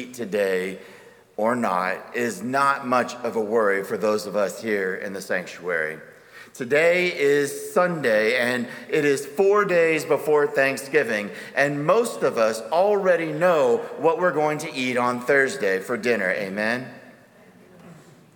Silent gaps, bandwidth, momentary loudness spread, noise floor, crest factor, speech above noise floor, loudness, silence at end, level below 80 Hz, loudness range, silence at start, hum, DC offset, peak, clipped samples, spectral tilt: none; 19.5 kHz; 8 LU; -51 dBFS; 18 dB; 29 dB; -22 LUFS; 0.45 s; -74 dBFS; 4 LU; 0 s; none; under 0.1%; -6 dBFS; under 0.1%; -4.5 dB/octave